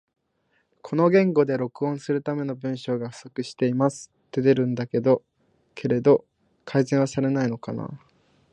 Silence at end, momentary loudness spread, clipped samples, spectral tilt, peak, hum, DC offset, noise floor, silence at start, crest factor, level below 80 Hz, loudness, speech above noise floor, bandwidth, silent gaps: 0.55 s; 13 LU; under 0.1%; -7.5 dB/octave; -6 dBFS; none; under 0.1%; -70 dBFS; 0.85 s; 18 dB; -68 dBFS; -24 LUFS; 47 dB; 10 kHz; none